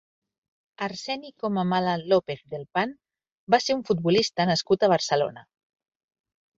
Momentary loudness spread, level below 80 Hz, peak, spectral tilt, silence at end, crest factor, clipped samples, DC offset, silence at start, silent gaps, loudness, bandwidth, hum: 11 LU; -66 dBFS; -6 dBFS; -5 dB/octave; 1.15 s; 22 dB; under 0.1%; under 0.1%; 0.8 s; 3.32-3.47 s; -25 LUFS; 7.8 kHz; none